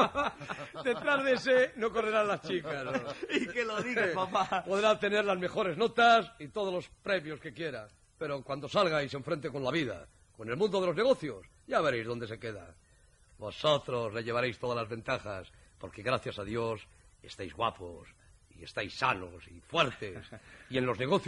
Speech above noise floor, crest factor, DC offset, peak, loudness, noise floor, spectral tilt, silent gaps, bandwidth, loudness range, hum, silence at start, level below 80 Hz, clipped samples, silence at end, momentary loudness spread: 30 dB; 20 dB; under 0.1%; -14 dBFS; -32 LUFS; -63 dBFS; -5 dB/octave; none; 11.5 kHz; 8 LU; none; 0 s; -62 dBFS; under 0.1%; 0 s; 16 LU